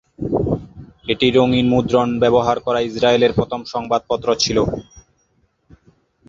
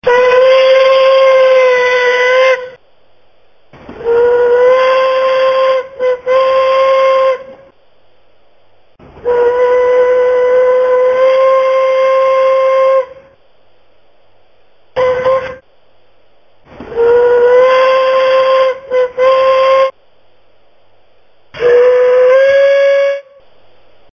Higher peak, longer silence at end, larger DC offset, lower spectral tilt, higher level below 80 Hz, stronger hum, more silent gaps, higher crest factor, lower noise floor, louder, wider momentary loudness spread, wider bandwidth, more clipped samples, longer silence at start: about the same, -2 dBFS vs 0 dBFS; first, 1.45 s vs 0.95 s; neither; first, -5.5 dB/octave vs -3 dB/octave; first, -42 dBFS vs -50 dBFS; neither; neither; first, 18 dB vs 10 dB; first, -63 dBFS vs -52 dBFS; second, -17 LUFS vs -9 LUFS; about the same, 9 LU vs 8 LU; first, 7.6 kHz vs 6.6 kHz; neither; first, 0.2 s vs 0.05 s